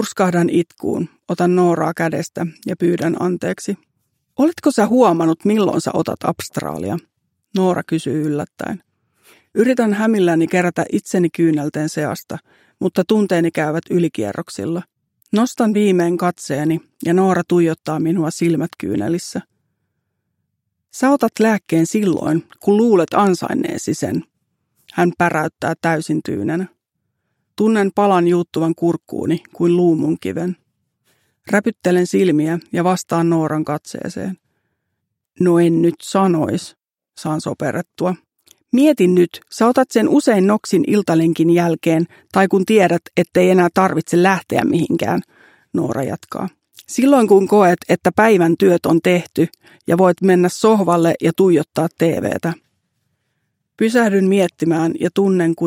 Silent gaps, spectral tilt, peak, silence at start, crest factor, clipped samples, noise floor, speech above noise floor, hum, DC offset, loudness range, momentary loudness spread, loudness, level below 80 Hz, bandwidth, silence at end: none; -6.5 dB/octave; 0 dBFS; 0 s; 16 dB; under 0.1%; -75 dBFS; 59 dB; none; under 0.1%; 5 LU; 11 LU; -17 LUFS; -62 dBFS; 16.5 kHz; 0 s